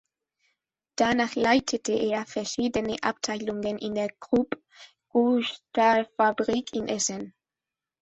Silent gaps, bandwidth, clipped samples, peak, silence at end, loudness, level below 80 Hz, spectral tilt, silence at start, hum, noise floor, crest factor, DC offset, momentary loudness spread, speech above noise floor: none; 8.2 kHz; under 0.1%; -8 dBFS; 0.75 s; -26 LUFS; -60 dBFS; -3.5 dB/octave; 1 s; none; -90 dBFS; 18 dB; under 0.1%; 8 LU; 64 dB